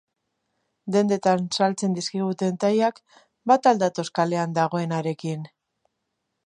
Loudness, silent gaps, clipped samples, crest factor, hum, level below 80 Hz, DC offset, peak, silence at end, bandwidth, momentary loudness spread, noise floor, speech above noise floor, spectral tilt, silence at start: -23 LUFS; none; under 0.1%; 20 dB; none; -74 dBFS; under 0.1%; -4 dBFS; 1 s; 11 kHz; 11 LU; -78 dBFS; 56 dB; -5.5 dB/octave; 0.85 s